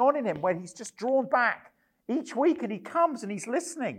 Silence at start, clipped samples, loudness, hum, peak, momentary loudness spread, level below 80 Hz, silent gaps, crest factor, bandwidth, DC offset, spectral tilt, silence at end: 0 s; under 0.1%; -28 LUFS; none; -12 dBFS; 10 LU; -74 dBFS; none; 18 dB; 13.5 kHz; under 0.1%; -5 dB/octave; 0 s